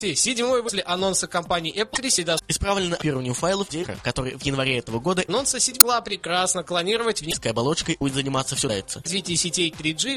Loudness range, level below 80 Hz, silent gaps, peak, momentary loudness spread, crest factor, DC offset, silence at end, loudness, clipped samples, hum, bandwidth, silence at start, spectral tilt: 4 LU; -46 dBFS; none; 0 dBFS; 6 LU; 24 dB; under 0.1%; 0 s; -22 LUFS; under 0.1%; none; 13 kHz; 0 s; -2.5 dB/octave